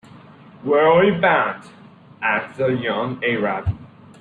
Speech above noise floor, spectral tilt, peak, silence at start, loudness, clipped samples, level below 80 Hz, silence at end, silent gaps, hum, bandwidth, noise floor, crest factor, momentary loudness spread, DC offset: 26 dB; -8 dB/octave; -4 dBFS; 0.6 s; -19 LUFS; under 0.1%; -48 dBFS; 0.35 s; none; none; 9.2 kHz; -44 dBFS; 16 dB; 13 LU; under 0.1%